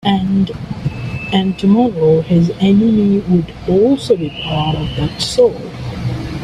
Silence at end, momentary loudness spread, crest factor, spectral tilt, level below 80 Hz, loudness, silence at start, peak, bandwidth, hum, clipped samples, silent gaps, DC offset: 0 s; 10 LU; 14 dB; -7 dB/octave; -36 dBFS; -15 LUFS; 0.05 s; 0 dBFS; 11.5 kHz; none; under 0.1%; none; under 0.1%